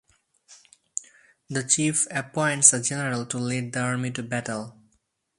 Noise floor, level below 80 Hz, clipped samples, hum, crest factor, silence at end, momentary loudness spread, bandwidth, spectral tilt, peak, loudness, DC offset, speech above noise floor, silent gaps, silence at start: -71 dBFS; -66 dBFS; under 0.1%; none; 26 dB; 0.65 s; 18 LU; 11.5 kHz; -3 dB/octave; 0 dBFS; -24 LUFS; under 0.1%; 46 dB; none; 0.5 s